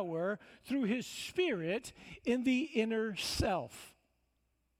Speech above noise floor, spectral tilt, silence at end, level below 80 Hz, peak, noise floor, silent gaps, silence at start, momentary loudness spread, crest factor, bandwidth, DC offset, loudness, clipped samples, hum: 44 dB; -4.5 dB/octave; 0.9 s; -56 dBFS; -18 dBFS; -79 dBFS; none; 0 s; 10 LU; 18 dB; 16 kHz; under 0.1%; -35 LUFS; under 0.1%; none